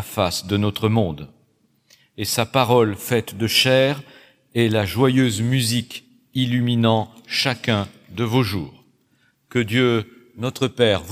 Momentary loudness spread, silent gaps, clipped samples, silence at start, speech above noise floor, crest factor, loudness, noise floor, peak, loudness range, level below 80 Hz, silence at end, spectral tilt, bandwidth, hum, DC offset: 12 LU; none; under 0.1%; 0 s; 43 dB; 18 dB; -20 LUFS; -63 dBFS; -2 dBFS; 4 LU; -54 dBFS; 0 s; -5 dB/octave; 16.5 kHz; none; under 0.1%